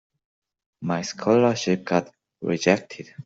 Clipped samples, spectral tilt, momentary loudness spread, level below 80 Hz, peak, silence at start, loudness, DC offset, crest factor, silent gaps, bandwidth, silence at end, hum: under 0.1%; -5.5 dB/octave; 13 LU; -64 dBFS; -4 dBFS; 0.8 s; -23 LUFS; under 0.1%; 20 dB; none; 8 kHz; 0.05 s; none